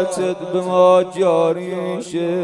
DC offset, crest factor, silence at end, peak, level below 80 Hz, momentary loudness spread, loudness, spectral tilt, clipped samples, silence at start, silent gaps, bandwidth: under 0.1%; 16 dB; 0 s; -2 dBFS; -64 dBFS; 11 LU; -17 LUFS; -6 dB/octave; under 0.1%; 0 s; none; 11.5 kHz